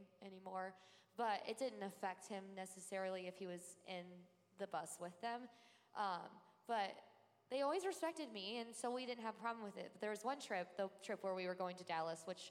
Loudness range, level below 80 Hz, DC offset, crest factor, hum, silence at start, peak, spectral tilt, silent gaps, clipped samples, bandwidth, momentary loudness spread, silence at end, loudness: 4 LU; under -90 dBFS; under 0.1%; 18 dB; none; 0 s; -30 dBFS; -3.5 dB/octave; none; under 0.1%; 16 kHz; 10 LU; 0 s; -47 LUFS